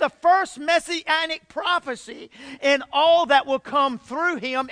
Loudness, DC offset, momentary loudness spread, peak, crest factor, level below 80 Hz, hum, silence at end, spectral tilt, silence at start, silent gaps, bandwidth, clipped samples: -21 LUFS; under 0.1%; 13 LU; -6 dBFS; 16 dB; -64 dBFS; none; 0 s; -2 dB/octave; 0 s; none; 10.5 kHz; under 0.1%